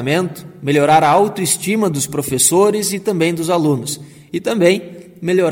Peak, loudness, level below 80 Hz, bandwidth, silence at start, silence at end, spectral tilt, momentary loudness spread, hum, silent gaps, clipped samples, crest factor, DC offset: 0 dBFS; -15 LUFS; -54 dBFS; 17 kHz; 0 s; 0 s; -4 dB/octave; 14 LU; none; none; under 0.1%; 16 dB; under 0.1%